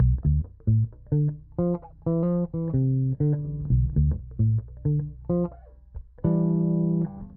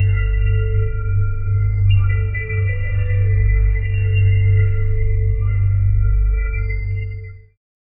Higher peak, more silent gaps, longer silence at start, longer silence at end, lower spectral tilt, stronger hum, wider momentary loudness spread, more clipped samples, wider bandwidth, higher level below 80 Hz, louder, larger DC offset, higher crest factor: second, -12 dBFS vs -4 dBFS; neither; about the same, 0 s vs 0 s; second, 0 s vs 0.6 s; first, -15.5 dB/octave vs -11.5 dB/octave; neither; about the same, 6 LU vs 7 LU; neither; second, 1.9 kHz vs 3 kHz; second, -34 dBFS vs -20 dBFS; second, -26 LUFS vs -19 LUFS; neither; about the same, 12 dB vs 12 dB